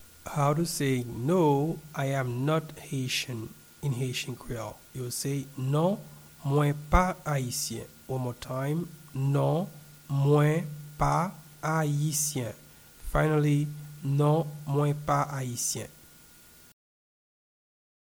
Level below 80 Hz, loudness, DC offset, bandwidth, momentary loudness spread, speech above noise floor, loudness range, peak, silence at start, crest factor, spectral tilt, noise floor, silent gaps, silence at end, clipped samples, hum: -44 dBFS; -29 LUFS; under 0.1%; over 20 kHz; 13 LU; 27 dB; 4 LU; -8 dBFS; 0 s; 22 dB; -5.5 dB/octave; -54 dBFS; none; 2.1 s; under 0.1%; none